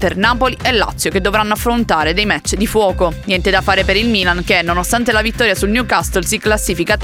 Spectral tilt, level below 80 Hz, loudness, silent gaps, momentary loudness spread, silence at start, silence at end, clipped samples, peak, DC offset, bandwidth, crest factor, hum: -3.5 dB/octave; -26 dBFS; -14 LUFS; none; 3 LU; 0 s; 0 s; under 0.1%; 0 dBFS; under 0.1%; 17 kHz; 14 dB; none